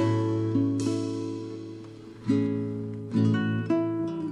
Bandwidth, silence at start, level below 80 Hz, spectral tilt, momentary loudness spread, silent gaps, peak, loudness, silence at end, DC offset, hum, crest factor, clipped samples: 10.5 kHz; 0 s; -64 dBFS; -7.5 dB/octave; 13 LU; none; -12 dBFS; -28 LUFS; 0 s; under 0.1%; none; 14 dB; under 0.1%